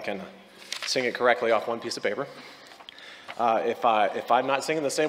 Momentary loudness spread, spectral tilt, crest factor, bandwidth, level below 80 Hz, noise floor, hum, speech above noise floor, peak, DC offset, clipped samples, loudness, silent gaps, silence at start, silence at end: 21 LU; -3 dB/octave; 22 dB; 16 kHz; -78 dBFS; -46 dBFS; none; 21 dB; -6 dBFS; under 0.1%; under 0.1%; -26 LUFS; none; 0 s; 0 s